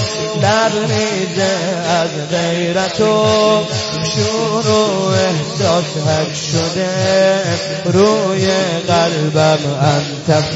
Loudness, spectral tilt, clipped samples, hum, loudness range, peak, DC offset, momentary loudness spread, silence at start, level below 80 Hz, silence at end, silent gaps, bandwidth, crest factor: -15 LUFS; -4.5 dB/octave; under 0.1%; none; 1 LU; 0 dBFS; under 0.1%; 5 LU; 0 s; -48 dBFS; 0 s; none; 8 kHz; 14 dB